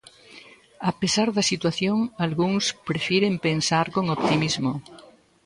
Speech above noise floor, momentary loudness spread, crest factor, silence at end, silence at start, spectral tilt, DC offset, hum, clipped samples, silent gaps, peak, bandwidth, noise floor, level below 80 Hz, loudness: 25 dB; 6 LU; 16 dB; 0.45 s; 0.35 s; -4.5 dB/octave; under 0.1%; none; under 0.1%; none; -8 dBFS; 11.5 kHz; -49 dBFS; -58 dBFS; -23 LUFS